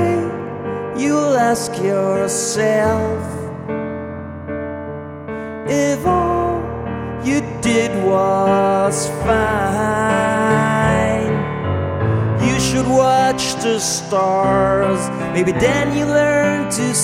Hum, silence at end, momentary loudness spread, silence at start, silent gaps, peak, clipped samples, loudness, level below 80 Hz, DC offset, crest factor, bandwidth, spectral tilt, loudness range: none; 0 s; 11 LU; 0 s; none; -2 dBFS; under 0.1%; -17 LUFS; -38 dBFS; under 0.1%; 14 dB; 16 kHz; -5 dB/octave; 5 LU